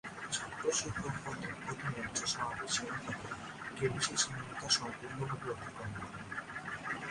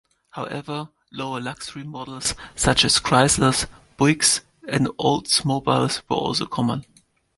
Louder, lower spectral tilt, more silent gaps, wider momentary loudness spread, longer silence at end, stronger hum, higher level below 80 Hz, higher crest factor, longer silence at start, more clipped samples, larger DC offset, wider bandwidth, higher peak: second, -37 LUFS vs -21 LUFS; about the same, -2.5 dB/octave vs -3.5 dB/octave; neither; second, 11 LU vs 16 LU; second, 0 s vs 0.55 s; neither; second, -62 dBFS vs -46 dBFS; about the same, 24 dB vs 22 dB; second, 0.05 s vs 0.35 s; neither; neither; about the same, 11.5 kHz vs 12 kHz; second, -16 dBFS vs -2 dBFS